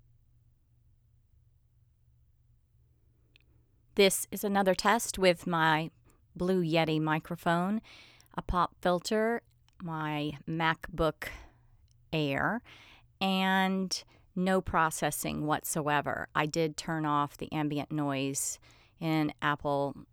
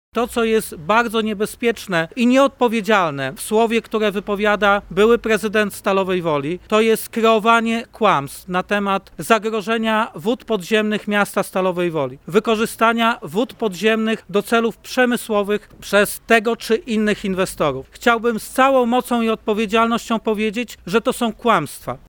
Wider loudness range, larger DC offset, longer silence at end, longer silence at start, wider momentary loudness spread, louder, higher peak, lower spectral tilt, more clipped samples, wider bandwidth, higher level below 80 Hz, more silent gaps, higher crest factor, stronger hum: first, 5 LU vs 2 LU; neither; about the same, 0.1 s vs 0.1 s; first, 3.95 s vs 0.15 s; first, 10 LU vs 6 LU; second, -30 LUFS vs -18 LUFS; second, -10 dBFS vs 0 dBFS; about the same, -4.5 dB/octave vs -4.5 dB/octave; neither; about the same, 19.5 kHz vs over 20 kHz; about the same, -54 dBFS vs -50 dBFS; neither; about the same, 22 dB vs 18 dB; neither